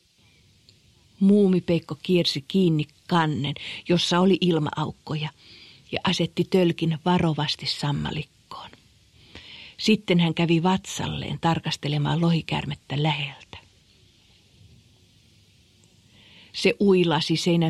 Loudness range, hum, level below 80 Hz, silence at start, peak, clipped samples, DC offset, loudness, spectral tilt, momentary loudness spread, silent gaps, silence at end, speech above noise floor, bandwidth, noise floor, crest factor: 6 LU; none; -56 dBFS; 1.2 s; -6 dBFS; under 0.1%; under 0.1%; -23 LUFS; -6 dB/octave; 13 LU; none; 0 s; 36 dB; 12.5 kHz; -59 dBFS; 18 dB